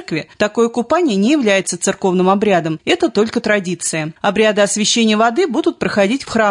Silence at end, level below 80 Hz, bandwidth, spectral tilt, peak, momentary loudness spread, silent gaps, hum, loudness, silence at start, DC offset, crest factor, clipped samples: 0 s; -54 dBFS; 11 kHz; -4 dB/octave; -2 dBFS; 6 LU; none; none; -15 LUFS; 0 s; under 0.1%; 12 dB; under 0.1%